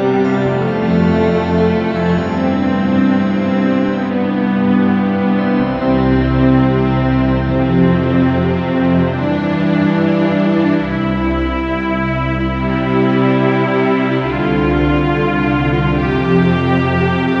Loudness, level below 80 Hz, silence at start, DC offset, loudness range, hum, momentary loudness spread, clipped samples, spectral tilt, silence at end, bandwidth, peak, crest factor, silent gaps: -14 LUFS; -30 dBFS; 0 s; under 0.1%; 2 LU; none; 4 LU; under 0.1%; -9 dB/octave; 0 s; 7 kHz; 0 dBFS; 14 dB; none